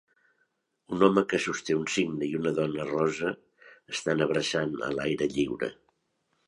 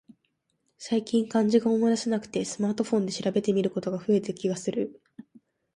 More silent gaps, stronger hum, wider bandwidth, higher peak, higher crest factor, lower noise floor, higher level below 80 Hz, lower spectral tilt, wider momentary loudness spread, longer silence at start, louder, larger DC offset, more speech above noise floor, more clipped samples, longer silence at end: neither; neither; about the same, 11.5 kHz vs 11 kHz; first, -6 dBFS vs -10 dBFS; about the same, 22 dB vs 18 dB; about the same, -75 dBFS vs -75 dBFS; first, -62 dBFS vs -70 dBFS; about the same, -5 dB/octave vs -6 dB/octave; about the same, 10 LU vs 8 LU; about the same, 0.9 s vs 0.8 s; about the same, -28 LUFS vs -27 LUFS; neither; about the same, 48 dB vs 50 dB; neither; about the same, 0.75 s vs 0.85 s